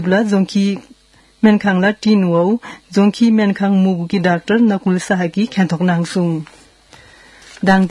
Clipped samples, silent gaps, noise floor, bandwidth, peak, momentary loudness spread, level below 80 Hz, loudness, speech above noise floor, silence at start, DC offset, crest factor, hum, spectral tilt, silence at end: under 0.1%; none; -50 dBFS; 11.5 kHz; 0 dBFS; 6 LU; -54 dBFS; -15 LUFS; 36 dB; 0 s; under 0.1%; 16 dB; none; -7 dB/octave; 0 s